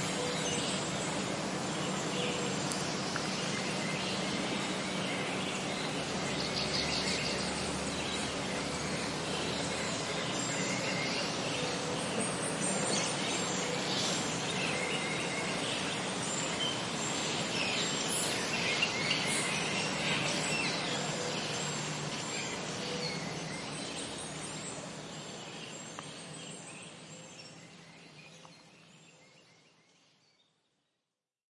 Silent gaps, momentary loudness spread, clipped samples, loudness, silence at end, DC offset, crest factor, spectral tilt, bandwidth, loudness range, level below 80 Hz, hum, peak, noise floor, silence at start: none; 12 LU; under 0.1%; -33 LUFS; 2.25 s; under 0.1%; 22 dB; -3 dB/octave; 11.5 kHz; 13 LU; -64 dBFS; none; -14 dBFS; -88 dBFS; 0 s